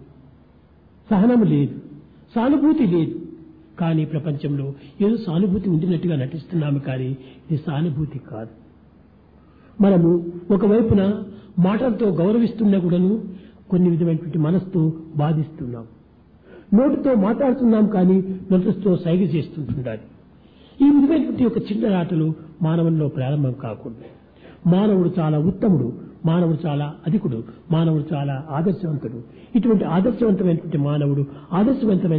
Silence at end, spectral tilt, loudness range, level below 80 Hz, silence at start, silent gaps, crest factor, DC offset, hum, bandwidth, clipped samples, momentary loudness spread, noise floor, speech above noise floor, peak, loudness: 0 s; -12.5 dB/octave; 4 LU; -50 dBFS; 0 s; none; 14 dB; under 0.1%; none; 4.8 kHz; under 0.1%; 12 LU; -51 dBFS; 32 dB; -6 dBFS; -20 LUFS